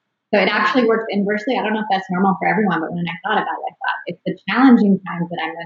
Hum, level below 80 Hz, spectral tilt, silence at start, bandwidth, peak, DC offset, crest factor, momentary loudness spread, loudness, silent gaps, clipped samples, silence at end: none; -70 dBFS; -4.5 dB/octave; 0.3 s; 7.2 kHz; -2 dBFS; under 0.1%; 16 dB; 11 LU; -18 LUFS; none; under 0.1%; 0 s